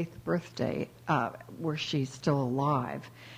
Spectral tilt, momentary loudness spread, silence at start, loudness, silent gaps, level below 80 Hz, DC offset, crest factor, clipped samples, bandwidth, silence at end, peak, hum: -6.5 dB/octave; 8 LU; 0 s; -32 LUFS; none; -64 dBFS; under 0.1%; 18 dB; under 0.1%; 15.5 kHz; 0 s; -14 dBFS; none